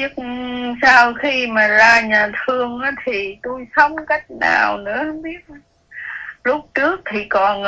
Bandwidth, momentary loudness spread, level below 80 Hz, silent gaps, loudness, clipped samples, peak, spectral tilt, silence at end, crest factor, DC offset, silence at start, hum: 8 kHz; 18 LU; -52 dBFS; none; -16 LUFS; under 0.1%; 0 dBFS; -3.5 dB/octave; 0 s; 18 dB; under 0.1%; 0 s; none